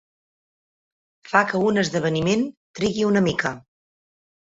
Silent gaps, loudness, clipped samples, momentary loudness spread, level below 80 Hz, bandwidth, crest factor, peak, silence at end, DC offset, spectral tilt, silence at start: 2.57-2.74 s; -22 LUFS; under 0.1%; 8 LU; -56 dBFS; 8 kHz; 22 dB; -2 dBFS; 0.9 s; under 0.1%; -5.5 dB/octave; 1.25 s